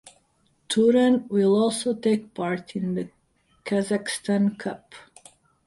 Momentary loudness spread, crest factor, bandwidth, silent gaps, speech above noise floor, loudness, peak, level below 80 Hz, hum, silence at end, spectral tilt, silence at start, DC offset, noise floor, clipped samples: 14 LU; 16 dB; 11.5 kHz; none; 43 dB; -24 LUFS; -8 dBFS; -66 dBFS; none; 0.65 s; -5.5 dB/octave; 0.7 s; under 0.1%; -66 dBFS; under 0.1%